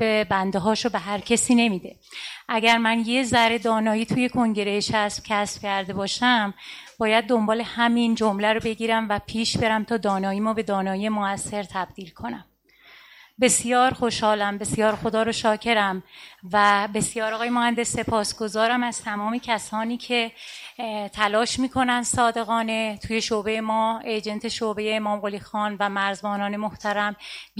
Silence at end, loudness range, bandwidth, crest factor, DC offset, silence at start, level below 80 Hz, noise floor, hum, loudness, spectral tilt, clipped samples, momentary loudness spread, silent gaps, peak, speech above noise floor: 0 s; 4 LU; 15.5 kHz; 20 dB; under 0.1%; 0 s; -54 dBFS; -53 dBFS; none; -23 LUFS; -3.5 dB/octave; under 0.1%; 10 LU; none; -4 dBFS; 30 dB